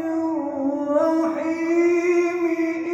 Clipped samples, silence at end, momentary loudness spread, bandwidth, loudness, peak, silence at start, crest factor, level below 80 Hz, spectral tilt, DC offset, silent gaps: under 0.1%; 0 s; 6 LU; 8 kHz; -22 LUFS; -10 dBFS; 0 s; 12 dB; -66 dBFS; -5.5 dB/octave; under 0.1%; none